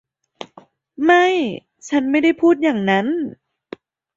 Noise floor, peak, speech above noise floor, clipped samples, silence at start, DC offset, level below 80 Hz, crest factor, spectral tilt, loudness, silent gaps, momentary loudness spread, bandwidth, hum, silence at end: -48 dBFS; -2 dBFS; 32 dB; under 0.1%; 0.4 s; under 0.1%; -64 dBFS; 16 dB; -5.5 dB/octave; -17 LUFS; none; 23 LU; 7.8 kHz; none; 0.85 s